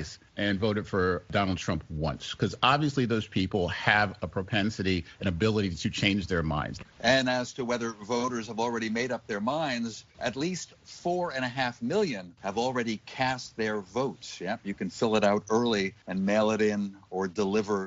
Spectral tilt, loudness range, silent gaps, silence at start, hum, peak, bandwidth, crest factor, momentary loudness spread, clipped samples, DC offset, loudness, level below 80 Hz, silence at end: -4 dB/octave; 4 LU; none; 0 s; none; -6 dBFS; 8 kHz; 24 dB; 9 LU; under 0.1%; under 0.1%; -29 LUFS; -52 dBFS; 0 s